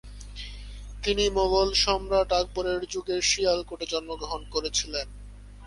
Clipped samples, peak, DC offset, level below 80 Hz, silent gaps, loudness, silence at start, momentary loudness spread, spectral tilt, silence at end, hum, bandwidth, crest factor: under 0.1%; -8 dBFS; under 0.1%; -40 dBFS; none; -26 LUFS; 0.05 s; 18 LU; -2.5 dB/octave; 0 s; 50 Hz at -40 dBFS; 11.5 kHz; 20 dB